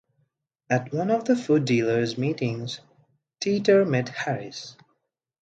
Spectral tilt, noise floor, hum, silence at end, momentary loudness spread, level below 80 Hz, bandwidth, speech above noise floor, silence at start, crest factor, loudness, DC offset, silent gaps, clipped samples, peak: -6 dB/octave; -76 dBFS; none; 0.7 s; 15 LU; -68 dBFS; 9 kHz; 52 dB; 0.7 s; 18 dB; -24 LUFS; under 0.1%; none; under 0.1%; -6 dBFS